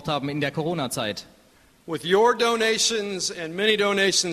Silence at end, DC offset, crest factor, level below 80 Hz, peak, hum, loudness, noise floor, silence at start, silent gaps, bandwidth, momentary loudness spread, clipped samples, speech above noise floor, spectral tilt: 0 s; under 0.1%; 18 dB; -60 dBFS; -6 dBFS; none; -22 LUFS; -56 dBFS; 0 s; none; 13.5 kHz; 10 LU; under 0.1%; 33 dB; -3 dB/octave